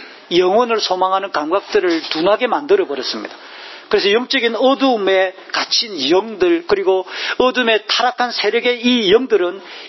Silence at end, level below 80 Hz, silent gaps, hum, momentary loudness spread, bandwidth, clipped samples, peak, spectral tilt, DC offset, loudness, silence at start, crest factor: 0 s; -58 dBFS; none; none; 7 LU; 6.2 kHz; under 0.1%; 0 dBFS; -3 dB/octave; under 0.1%; -16 LUFS; 0 s; 16 dB